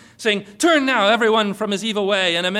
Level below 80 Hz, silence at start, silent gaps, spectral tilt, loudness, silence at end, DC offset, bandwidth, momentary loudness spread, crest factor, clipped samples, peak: -64 dBFS; 0.2 s; none; -3.5 dB/octave; -18 LUFS; 0 s; under 0.1%; 15.5 kHz; 6 LU; 12 dB; under 0.1%; -6 dBFS